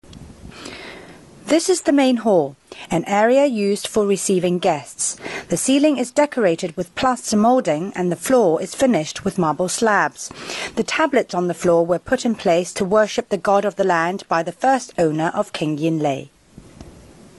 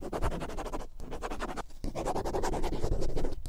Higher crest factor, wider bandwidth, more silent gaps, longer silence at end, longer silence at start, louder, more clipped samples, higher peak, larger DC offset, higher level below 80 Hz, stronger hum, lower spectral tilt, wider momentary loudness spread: about the same, 16 dB vs 14 dB; about the same, 12 kHz vs 12.5 kHz; neither; first, 0.4 s vs 0 s; about the same, 0.1 s vs 0 s; first, -19 LUFS vs -37 LUFS; neither; first, -2 dBFS vs -16 dBFS; neither; second, -54 dBFS vs -36 dBFS; neither; about the same, -4.5 dB/octave vs -5.5 dB/octave; first, 10 LU vs 7 LU